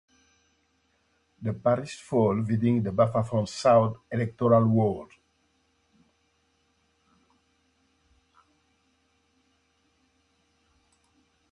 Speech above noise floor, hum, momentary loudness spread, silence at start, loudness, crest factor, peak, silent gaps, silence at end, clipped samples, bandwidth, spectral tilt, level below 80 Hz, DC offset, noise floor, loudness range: 46 dB; none; 10 LU; 1.4 s; -25 LUFS; 22 dB; -8 dBFS; none; 6.45 s; under 0.1%; 11 kHz; -8 dB/octave; -60 dBFS; under 0.1%; -70 dBFS; 5 LU